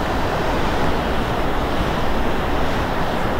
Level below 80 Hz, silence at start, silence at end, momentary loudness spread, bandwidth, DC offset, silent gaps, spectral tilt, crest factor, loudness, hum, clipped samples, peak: -26 dBFS; 0 s; 0 s; 1 LU; 16 kHz; under 0.1%; none; -6 dB/octave; 12 dB; -21 LUFS; none; under 0.1%; -6 dBFS